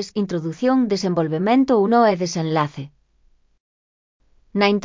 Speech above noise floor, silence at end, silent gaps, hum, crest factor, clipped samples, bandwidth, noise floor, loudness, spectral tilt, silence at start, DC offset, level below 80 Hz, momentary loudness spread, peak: 40 dB; 0 s; 3.60-4.20 s; none; 18 dB; under 0.1%; 7.6 kHz; -58 dBFS; -19 LUFS; -6 dB/octave; 0 s; under 0.1%; -60 dBFS; 10 LU; -4 dBFS